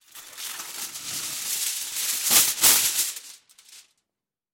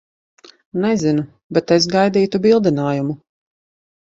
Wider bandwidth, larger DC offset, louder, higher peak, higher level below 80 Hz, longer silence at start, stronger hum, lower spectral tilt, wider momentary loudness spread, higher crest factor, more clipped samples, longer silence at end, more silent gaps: first, 17 kHz vs 7.8 kHz; neither; second, -21 LUFS vs -17 LUFS; about the same, -2 dBFS vs 0 dBFS; second, -64 dBFS vs -56 dBFS; second, 0.15 s vs 0.75 s; neither; second, 2 dB/octave vs -6 dB/octave; first, 18 LU vs 9 LU; first, 24 dB vs 18 dB; neither; second, 0.75 s vs 1 s; second, none vs 1.43-1.50 s